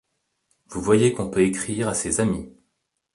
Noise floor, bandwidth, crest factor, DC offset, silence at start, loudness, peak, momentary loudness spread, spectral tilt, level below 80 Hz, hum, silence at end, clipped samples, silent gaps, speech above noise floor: -75 dBFS; 11.5 kHz; 20 dB; under 0.1%; 0.7 s; -22 LUFS; -4 dBFS; 11 LU; -5 dB/octave; -50 dBFS; none; 0.65 s; under 0.1%; none; 54 dB